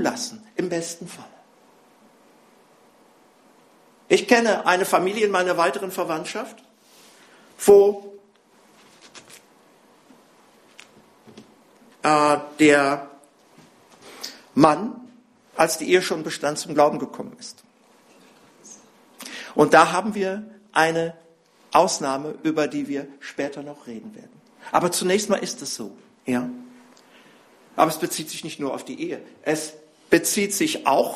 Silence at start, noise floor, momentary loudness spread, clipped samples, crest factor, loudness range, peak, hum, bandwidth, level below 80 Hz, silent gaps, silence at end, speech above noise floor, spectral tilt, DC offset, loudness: 0 s; -56 dBFS; 20 LU; under 0.1%; 24 dB; 6 LU; 0 dBFS; none; 14 kHz; -66 dBFS; none; 0 s; 35 dB; -3.5 dB/octave; under 0.1%; -21 LUFS